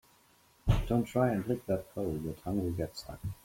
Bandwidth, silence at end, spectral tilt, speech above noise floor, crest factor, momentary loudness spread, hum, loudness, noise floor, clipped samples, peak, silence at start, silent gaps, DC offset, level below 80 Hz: 16.5 kHz; 0.1 s; -7.5 dB/octave; 32 dB; 20 dB; 9 LU; none; -34 LUFS; -65 dBFS; under 0.1%; -14 dBFS; 0.65 s; none; under 0.1%; -44 dBFS